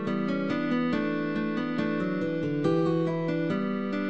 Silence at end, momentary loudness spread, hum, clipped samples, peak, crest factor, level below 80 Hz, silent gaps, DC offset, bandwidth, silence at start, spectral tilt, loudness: 0 s; 4 LU; none; under 0.1%; -14 dBFS; 14 dB; -66 dBFS; none; 0.3%; 8.4 kHz; 0 s; -8 dB/octave; -28 LUFS